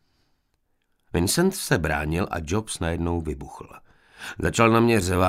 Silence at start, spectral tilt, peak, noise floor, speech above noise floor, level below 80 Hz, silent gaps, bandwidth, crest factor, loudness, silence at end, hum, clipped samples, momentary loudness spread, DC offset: 1.15 s; -5 dB/octave; -4 dBFS; -70 dBFS; 47 dB; -40 dBFS; none; 16 kHz; 22 dB; -23 LUFS; 0 s; none; under 0.1%; 18 LU; under 0.1%